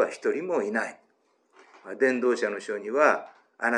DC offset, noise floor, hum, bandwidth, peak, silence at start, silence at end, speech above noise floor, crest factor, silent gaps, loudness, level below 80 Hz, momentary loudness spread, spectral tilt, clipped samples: under 0.1%; -68 dBFS; none; 10.5 kHz; -6 dBFS; 0 s; 0 s; 42 dB; 22 dB; none; -26 LUFS; under -90 dBFS; 9 LU; -4.5 dB/octave; under 0.1%